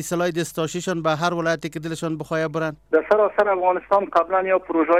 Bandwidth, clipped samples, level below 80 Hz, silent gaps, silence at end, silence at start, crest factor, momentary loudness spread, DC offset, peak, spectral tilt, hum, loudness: 16 kHz; under 0.1%; -56 dBFS; none; 0 s; 0 s; 16 dB; 8 LU; under 0.1%; -6 dBFS; -5 dB/octave; none; -22 LUFS